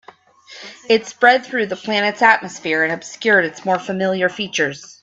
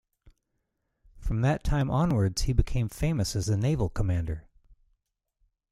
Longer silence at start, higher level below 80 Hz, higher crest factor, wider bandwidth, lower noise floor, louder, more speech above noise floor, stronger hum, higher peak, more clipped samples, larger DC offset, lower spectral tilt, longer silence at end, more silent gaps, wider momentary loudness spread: second, 0.5 s vs 1.15 s; second, -66 dBFS vs -36 dBFS; about the same, 18 dB vs 20 dB; second, 8.2 kHz vs 15 kHz; second, -45 dBFS vs -79 dBFS; first, -17 LUFS vs -28 LUFS; second, 27 dB vs 53 dB; neither; first, 0 dBFS vs -8 dBFS; neither; neither; second, -3.5 dB/octave vs -6.5 dB/octave; second, 0.15 s vs 1.3 s; neither; about the same, 8 LU vs 7 LU